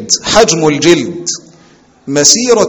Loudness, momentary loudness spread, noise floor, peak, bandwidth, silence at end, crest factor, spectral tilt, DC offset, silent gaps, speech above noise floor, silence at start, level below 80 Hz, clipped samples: -9 LUFS; 12 LU; -44 dBFS; 0 dBFS; over 20 kHz; 0 s; 10 dB; -2.5 dB/octave; under 0.1%; none; 35 dB; 0 s; -40 dBFS; 1%